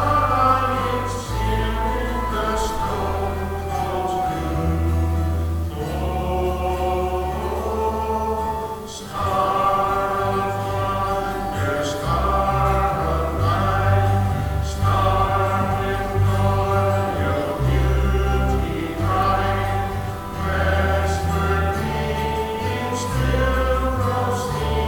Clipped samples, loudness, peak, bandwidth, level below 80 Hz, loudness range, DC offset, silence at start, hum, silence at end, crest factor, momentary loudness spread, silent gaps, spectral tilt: under 0.1%; -22 LUFS; -4 dBFS; 18 kHz; -28 dBFS; 3 LU; 0.3%; 0 s; none; 0 s; 16 dB; 6 LU; none; -6.5 dB/octave